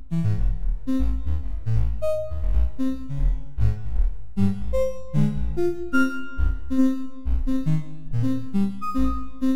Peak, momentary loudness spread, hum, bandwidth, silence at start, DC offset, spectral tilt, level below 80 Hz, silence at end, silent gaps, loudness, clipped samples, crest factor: -8 dBFS; 5 LU; none; 13.5 kHz; 0 s; 6%; -8.5 dB/octave; -28 dBFS; 0 s; none; -26 LUFS; under 0.1%; 14 dB